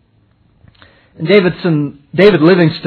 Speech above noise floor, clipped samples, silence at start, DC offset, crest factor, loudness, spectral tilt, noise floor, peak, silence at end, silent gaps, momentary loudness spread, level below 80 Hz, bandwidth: 43 dB; 0.4%; 1.2 s; under 0.1%; 12 dB; -11 LUFS; -9.5 dB/octave; -53 dBFS; 0 dBFS; 0 s; none; 11 LU; -48 dBFS; 5.4 kHz